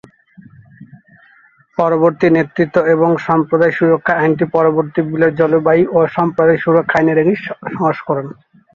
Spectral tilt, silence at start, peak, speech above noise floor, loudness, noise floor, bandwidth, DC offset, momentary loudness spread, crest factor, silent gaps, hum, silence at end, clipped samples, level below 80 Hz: -9 dB/octave; 0.8 s; 0 dBFS; 36 dB; -14 LUFS; -50 dBFS; 6.8 kHz; under 0.1%; 6 LU; 14 dB; none; none; 0.4 s; under 0.1%; -54 dBFS